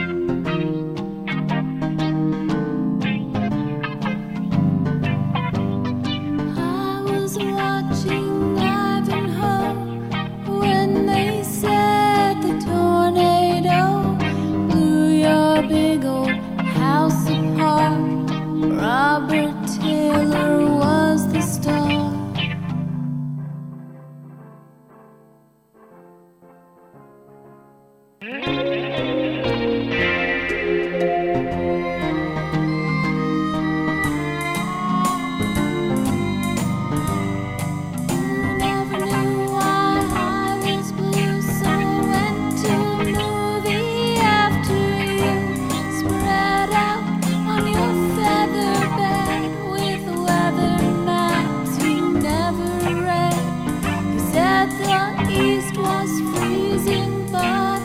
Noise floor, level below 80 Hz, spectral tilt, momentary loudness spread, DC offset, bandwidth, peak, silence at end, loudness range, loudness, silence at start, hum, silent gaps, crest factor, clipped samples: -54 dBFS; -44 dBFS; -6 dB/octave; 7 LU; under 0.1%; 16.5 kHz; -4 dBFS; 0 s; 5 LU; -20 LUFS; 0 s; none; none; 16 dB; under 0.1%